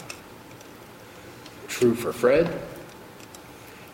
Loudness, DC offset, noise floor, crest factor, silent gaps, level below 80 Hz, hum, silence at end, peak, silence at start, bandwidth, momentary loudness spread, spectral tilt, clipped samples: -24 LUFS; under 0.1%; -45 dBFS; 20 dB; none; -56 dBFS; none; 0 s; -8 dBFS; 0 s; 16.5 kHz; 23 LU; -5.5 dB/octave; under 0.1%